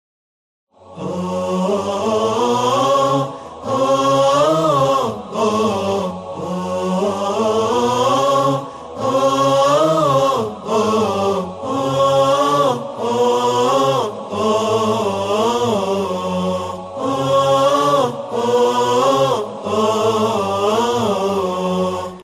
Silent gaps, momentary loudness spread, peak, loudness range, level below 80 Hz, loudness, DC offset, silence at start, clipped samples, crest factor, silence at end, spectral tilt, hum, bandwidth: none; 8 LU; -4 dBFS; 2 LU; -56 dBFS; -17 LUFS; under 0.1%; 0.85 s; under 0.1%; 14 dB; 0 s; -5 dB/octave; none; 14 kHz